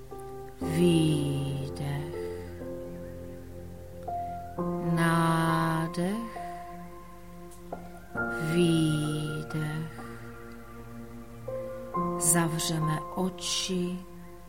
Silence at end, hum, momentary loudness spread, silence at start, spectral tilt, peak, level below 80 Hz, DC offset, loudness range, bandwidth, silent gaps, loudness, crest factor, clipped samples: 0 s; none; 20 LU; 0 s; -5 dB/octave; -10 dBFS; -52 dBFS; 0.3%; 6 LU; 16.5 kHz; none; -29 LUFS; 22 dB; under 0.1%